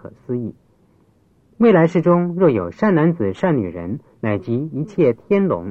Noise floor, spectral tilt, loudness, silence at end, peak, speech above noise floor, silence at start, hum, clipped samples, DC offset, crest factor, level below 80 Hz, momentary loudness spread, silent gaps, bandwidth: -56 dBFS; -9.5 dB/octave; -18 LUFS; 0 s; -2 dBFS; 39 dB; 0.05 s; none; under 0.1%; under 0.1%; 16 dB; -54 dBFS; 12 LU; none; 7 kHz